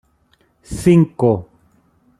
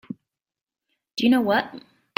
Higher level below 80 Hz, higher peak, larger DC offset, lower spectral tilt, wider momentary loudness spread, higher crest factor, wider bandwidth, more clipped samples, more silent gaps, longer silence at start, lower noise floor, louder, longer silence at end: first, -44 dBFS vs -66 dBFS; first, -2 dBFS vs -6 dBFS; neither; first, -8 dB/octave vs -5 dB/octave; second, 11 LU vs 21 LU; about the same, 16 dB vs 18 dB; second, 13 kHz vs 16.5 kHz; neither; second, none vs 0.63-0.67 s; first, 0.7 s vs 0.1 s; second, -59 dBFS vs under -90 dBFS; first, -16 LUFS vs -21 LUFS; first, 0.75 s vs 0.4 s